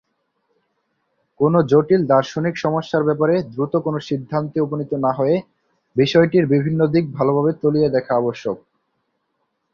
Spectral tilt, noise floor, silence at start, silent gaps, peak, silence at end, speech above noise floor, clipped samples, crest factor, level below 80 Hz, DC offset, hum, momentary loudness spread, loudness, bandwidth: -8 dB/octave; -72 dBFS; 1.4 s; none; -2 dBFS; 1.15 s; 54 dB; under 0.1%; 16 dB; -58 dBFS; under 0.1%; none; 8 LU; -19 LUFS; 7 kHz